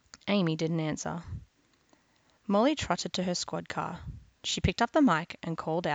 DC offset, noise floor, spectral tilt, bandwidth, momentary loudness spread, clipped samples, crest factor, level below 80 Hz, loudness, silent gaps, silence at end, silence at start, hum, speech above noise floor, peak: under 0.1%; -67 dBFS; -5 dB/octave; 9.2 kHz; 15 LU; under 0.1%; 18 dB; -50 dBFS; -30 LUFS; none; 0 s; 0.15 s; none; 38 dB; -14 dBFS